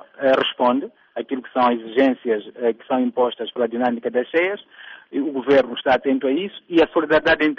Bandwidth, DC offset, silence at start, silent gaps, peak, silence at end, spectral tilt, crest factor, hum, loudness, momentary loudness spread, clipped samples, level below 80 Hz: 6.6 kHz; under 0.1%; 0.2 s; none; -6 dBFS; 0.05 s; -2 dB/octave; 14 dB; none; -20 LUFS; 10 LU; under 0.1%; -56 dBFS